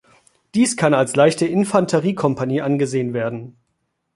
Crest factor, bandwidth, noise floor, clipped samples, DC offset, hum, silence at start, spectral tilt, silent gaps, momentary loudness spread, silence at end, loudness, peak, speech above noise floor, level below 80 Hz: 18 dB; 11.5 kHz; -72 dBFS; under 0.1%; under 0.1%; none; 0.55 s; -5.5 dB/octave; none; 9 LU; 0.65 s; -18 LUFS; -2 dBFS; 54 dB; -60 dBFS